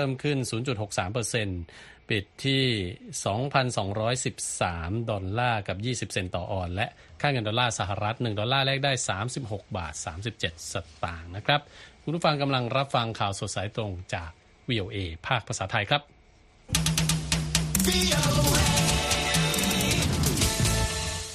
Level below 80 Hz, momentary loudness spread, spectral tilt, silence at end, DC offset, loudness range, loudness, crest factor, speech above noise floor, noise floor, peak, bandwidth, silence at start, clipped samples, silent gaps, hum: -42 dBFS; 11 LU; -3.5 dB/octave; 0 s; under 0.1%; 7 LU; -27 LUFS; 22 dB; 29 dB; -57 dBFS; -6 dBFS; 14 kHz; 0 s; under 0.1%; none; none